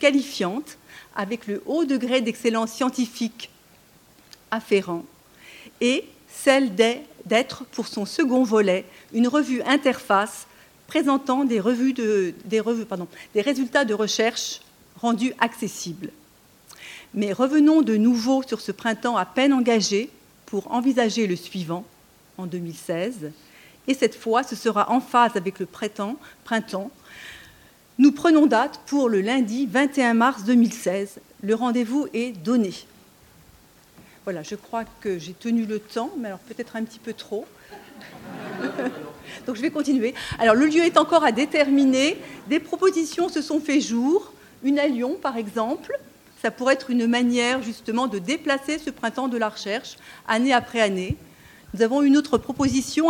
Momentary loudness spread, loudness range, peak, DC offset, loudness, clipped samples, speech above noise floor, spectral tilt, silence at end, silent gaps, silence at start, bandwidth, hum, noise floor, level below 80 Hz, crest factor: 15 LU; 9 LU; 0 dBFS; under 0.1%; -23 LUFS; under 0.1%; 32 dB; -4.5 dB/octave; 0 s; none; 0 s; 17.5 kHz; none; -54 dBFS; -60 dBFS; 22 dB